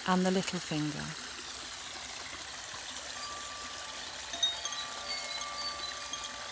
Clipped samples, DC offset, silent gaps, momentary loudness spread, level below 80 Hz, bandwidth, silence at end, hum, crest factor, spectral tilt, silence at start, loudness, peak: under 0.1%; under 0.1%; none; 9 LU; -62 dBFS; 8 kHz; 0 s; none; 22 dB; -3 dB/octave; 0 s; -36 LUFS; -16 dBFS